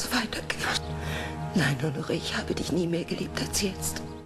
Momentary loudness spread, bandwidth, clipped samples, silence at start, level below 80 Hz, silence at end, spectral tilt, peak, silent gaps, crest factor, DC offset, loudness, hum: 6 LU; 15.5 kHz; under 0.1%; 0 s; -48 dBFS; 0 s; -4 dB/octave; -16 dBFS; none; 14 dB; under 0.1%; -29 LUFS; none